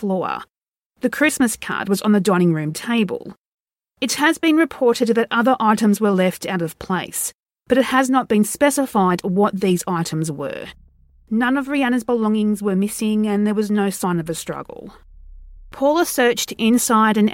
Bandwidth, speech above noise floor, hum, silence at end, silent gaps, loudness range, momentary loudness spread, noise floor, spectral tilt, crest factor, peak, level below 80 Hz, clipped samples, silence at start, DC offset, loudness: 17 kHz; 46 dB; none; 0 s; 0.63-0.72 s, 0.79-0.90 s, 3.38-3.66 s, 7.34-7.46 s; 3 LU; 9 LU; -64 dBFS; -5 dB/octave; 18 dB; -2 dBFS; -52 dBFS; under 0.1%; 0 s; under 0.1%; -19 LUFS